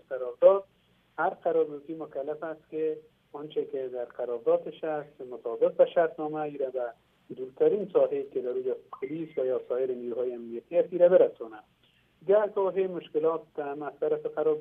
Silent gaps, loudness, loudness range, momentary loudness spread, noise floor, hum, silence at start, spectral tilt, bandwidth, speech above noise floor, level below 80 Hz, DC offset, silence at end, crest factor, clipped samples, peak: none; -29 LUFS; 6 LU; 15 LU; -65 dBFS; none; 0.1 s; -9 dB/octave; 3.7 kHz; 37 dB; -78 dBFS; under 0.1%; 0 s; 22 dB; under 0.1%; -8 dBFS